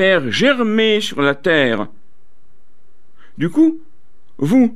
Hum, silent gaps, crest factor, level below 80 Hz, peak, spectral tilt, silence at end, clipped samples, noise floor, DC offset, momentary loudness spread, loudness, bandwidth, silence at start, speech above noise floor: none; none; 14 dB; -58 dBFS; -4 dBFS; -5.5 dB/octave; 0 s; under 0.1%; -61 dBFS; 4%; 10 LU; -16 LUFS; 14 kHz; 0 s; 46 dB